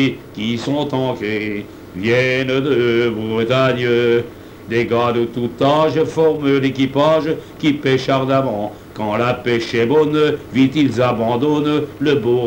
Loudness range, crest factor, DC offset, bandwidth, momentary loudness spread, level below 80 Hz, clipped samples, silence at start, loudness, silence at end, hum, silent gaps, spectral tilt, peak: 1 LU; 14 dB; under 0.1%; 17 kHz; 7 LU; -50 dBFS; under 0.1%; 0 s; -17 LUFS; 0 s; none; none; -6.5 dB/octave; -2 dBFS